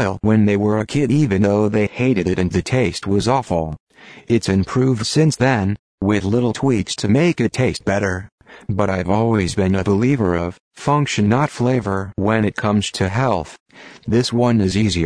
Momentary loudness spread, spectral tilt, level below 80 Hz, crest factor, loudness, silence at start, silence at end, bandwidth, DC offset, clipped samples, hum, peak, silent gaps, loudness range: 7 LU; -6 dB/octave; -42 dBFS; 14 dB; -18 LUFS; 0 s; 0 s; 10.5 kHz; under 0.1%; under 0.1%; none; -2 dBFS; 3.80-3.87 s, 5.79-5.98 s, 8.32-8.38 s, 10.60-10.71 s, 13.60-13.66 s; 2 LU